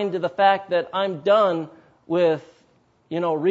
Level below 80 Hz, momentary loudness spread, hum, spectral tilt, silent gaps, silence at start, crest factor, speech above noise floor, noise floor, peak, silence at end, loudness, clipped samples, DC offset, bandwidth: -72 dBFS; 11 LU; none; -7 dB/octave; none; 0 s; 18 dB; 40 dB; -60 dBFS; -4 dBFS; 0 s; -22 LUFS; under 0.1%; under 0.1%; 7.8 kHz